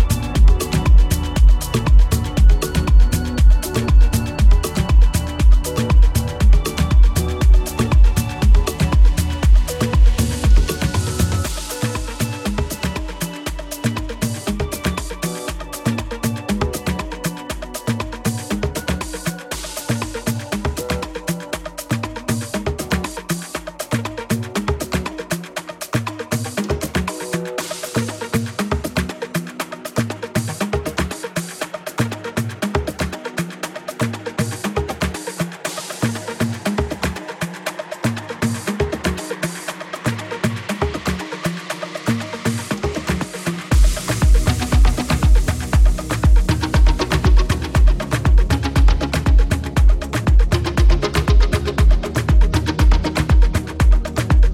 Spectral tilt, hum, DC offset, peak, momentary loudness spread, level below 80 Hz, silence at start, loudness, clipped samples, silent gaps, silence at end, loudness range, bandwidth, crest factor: -5.5 dB/octave; none; under 0.1%; -4 dBFS; 10 LU; -18 dBFS; 0 s; -20 LUFS; under 0.1%; none; 0 s; 7 LU; 15.5 kHz; 12 dB